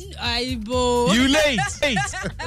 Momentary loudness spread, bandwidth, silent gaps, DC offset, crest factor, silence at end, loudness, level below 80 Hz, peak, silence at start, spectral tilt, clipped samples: 7 LU; 16 kHz; none; under 0.1%; 12 dB; 0 s; -20 LUFS; -38 dBFS; -8 dBFS; 0 s; -3.5 dB/octave; under 0.1%